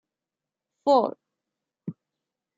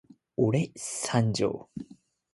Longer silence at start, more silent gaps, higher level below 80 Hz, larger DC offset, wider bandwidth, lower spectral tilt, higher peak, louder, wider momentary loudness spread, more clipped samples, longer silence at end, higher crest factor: first, 0.85 s vs 0.4 s; neither; second, -82 dBFS vs -60 dBFS; neither; second, 7.8 kHz vs 11.5 kHz; first, -7 dB/octave vs -5.5 dB/octave; about the same, -8 dBFS vs -10 dBFS; first, -24 LUFS vs -29 LUFS; about the same, 19 LU vs 17 LU; neither; first, 0.65 s vs 0.5 s; about the same, 20 dB vs 20 dB